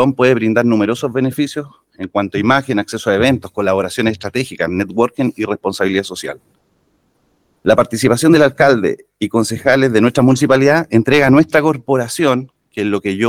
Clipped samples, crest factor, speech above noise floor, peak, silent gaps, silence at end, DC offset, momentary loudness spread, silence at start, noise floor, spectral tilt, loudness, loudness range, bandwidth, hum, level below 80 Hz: under 0.1%; 14 dB; 46 dB; 0 dBFS; none; 0 s; under 0.1%; 10 LU; 0 s; -60 dBFS; -5.5 dB/octave; -14 LUFS; 6 LU; 16.5 kHz; none; -50 dBFS